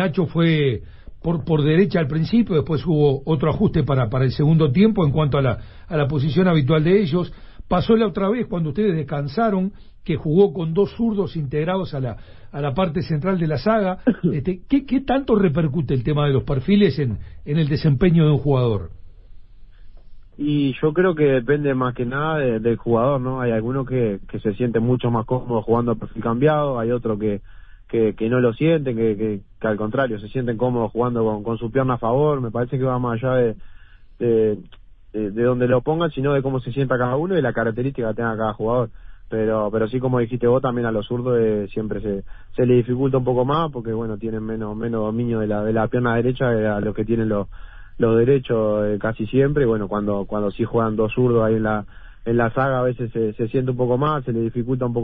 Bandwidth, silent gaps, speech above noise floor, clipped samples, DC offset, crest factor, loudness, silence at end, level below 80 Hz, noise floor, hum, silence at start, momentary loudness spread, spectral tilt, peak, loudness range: 5.8 kHz; none; 21 dB; under 0.1%; under 0.1%; 16 dB; -20 LUFS; 0 s; -40 dBFS; -40 dBFS; none; 0 s; 8 LU; -12.5 dB/octave; -4 dBFS; 3 LU